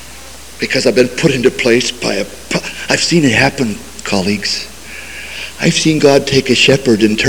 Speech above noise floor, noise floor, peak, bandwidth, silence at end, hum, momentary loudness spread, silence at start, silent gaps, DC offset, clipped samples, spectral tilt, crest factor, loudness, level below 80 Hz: 21 dB; -33 dBFS; 0 dBFS; over 20 kHz; 0 s; none; 16 LU; 0 s; none; 2%; 0.2%; -4 dB/octave; 14 dB; -12 LUFS; -40 dBFS